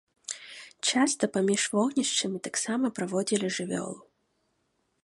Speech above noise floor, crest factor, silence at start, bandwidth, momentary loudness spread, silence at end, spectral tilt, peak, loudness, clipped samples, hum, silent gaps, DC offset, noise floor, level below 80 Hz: 47 dB; 20 dB; 0.3 s; 11.5 kHz; 14 LU; 1 s; -3 dB/octave; -10 dBFS; -28 LUFS; under 0.1%; none; none; under 0.1%; -75 dBFS; -76 dBFS